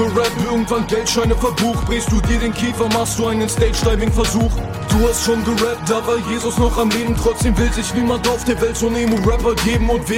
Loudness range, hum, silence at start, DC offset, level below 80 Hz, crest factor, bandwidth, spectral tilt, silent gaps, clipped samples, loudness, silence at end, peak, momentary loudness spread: 1 LU; none; 0 s; under 0.1%; -24 dBFS; 14 dB; 16.5 kHz; -5 dB/octave; none; under 0.1%; -17 LUFS; 0 s; -2 dBFS; 3 LU